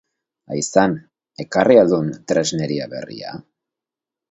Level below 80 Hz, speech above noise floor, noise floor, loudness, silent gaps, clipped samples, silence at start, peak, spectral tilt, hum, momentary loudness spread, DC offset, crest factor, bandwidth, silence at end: -58 dBFS; 70 dB; -87 dBFS; -18 LUFS; none; under 0.1%; 0.5 s; 0 dBFS; -5 dB/octave; none; 19 LU; under 0.1%; 20 dB; 8.2 kHz; 0.9 s